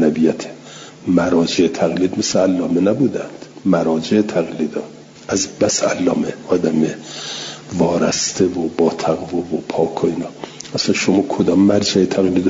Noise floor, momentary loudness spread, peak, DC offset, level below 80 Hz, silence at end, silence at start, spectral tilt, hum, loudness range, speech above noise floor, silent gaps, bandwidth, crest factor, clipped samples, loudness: -37 dBFS; 12 LU; -2 dBFS; under 0.1%; -54 dBFS; 0 s; 0 s; -4.5 dB/octave; none; 2 LU; 20 dB; none; 7.8 kHz; 14 dB; under 0.1%; -17 LUFS